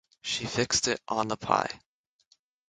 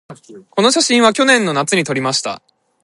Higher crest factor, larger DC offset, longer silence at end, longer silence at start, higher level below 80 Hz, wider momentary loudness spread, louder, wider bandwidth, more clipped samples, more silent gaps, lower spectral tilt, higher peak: first, 26 dB vs 16 dB; neither; first, 0.9 s vs 0.45 s; first, 0.25 s vs 0.1 s; about the same, -60 dBFS vs -64 dBFS; second, 8 LU vs 12 LU; second, -28 LUFS vs -14 LUFS; about the same, 11 kHz vs 11.5 kHz; neither; neither; about the same, -2.5 dB/octave vs -3 dB/octave; second, -6 dBFS vs 0 dBFS